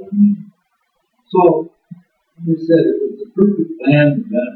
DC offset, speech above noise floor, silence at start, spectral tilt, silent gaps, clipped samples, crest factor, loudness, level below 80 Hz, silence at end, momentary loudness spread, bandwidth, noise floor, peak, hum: under 0.1%; 52 dB; 0 s; -11 dB/octave; none; under 0.1%; 16 dB; -15 LUFS; -62 dBFS; 0 s; 10 LU; 4.4 kHz; -66 dBFS; 0 dBFS; none